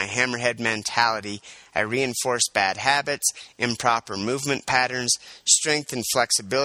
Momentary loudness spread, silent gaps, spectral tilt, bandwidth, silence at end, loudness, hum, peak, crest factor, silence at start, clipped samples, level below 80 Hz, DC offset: 8 LU; none; -1.5 dB/octave; 15.5 kHz; 0 s; -22 LUFS; none; -2 dBFS; 22 dB; 0 s; under 0.1%; -62 dBFS; under 0.1%